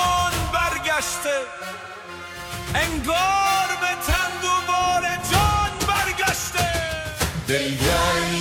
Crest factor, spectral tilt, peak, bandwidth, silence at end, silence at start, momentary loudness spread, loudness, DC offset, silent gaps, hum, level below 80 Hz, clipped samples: 18 dB; -3 dB/octave; -4 dBFS; 18 kHz; 0 s; 0 s; 13 LU; -21 LUFS; under 0.1%; none; none; -36 dBFS; under 0.1%